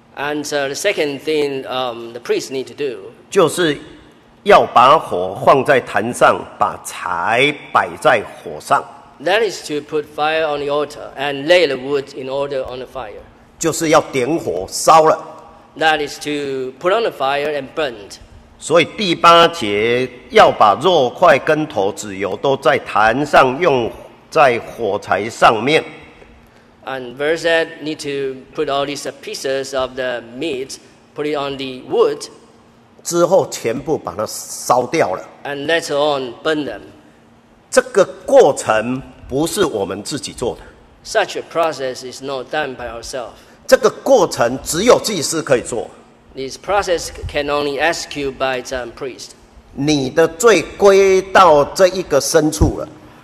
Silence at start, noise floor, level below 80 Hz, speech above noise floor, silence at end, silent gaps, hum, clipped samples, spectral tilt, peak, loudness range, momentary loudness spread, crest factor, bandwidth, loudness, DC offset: 0.15 s; -48 dBFS; -42 dBFS; 32 dB; 0.15 s; none; none; under 0.1%; -3.5 dB/octave; 0 dBFS; 8 LU; 15 LU; 16 dB; 14 kHz; -16 LUFS; under 0.1%